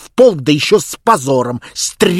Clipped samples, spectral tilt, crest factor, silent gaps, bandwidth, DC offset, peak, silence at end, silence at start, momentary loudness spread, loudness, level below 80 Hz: 0.5%; -4 dB/octave; 12 dB; none; 16 kHz; under 0.1%; 0 dBFS; 0 s; 0 s; 8 LU; -13 LUFS; -50 dBFS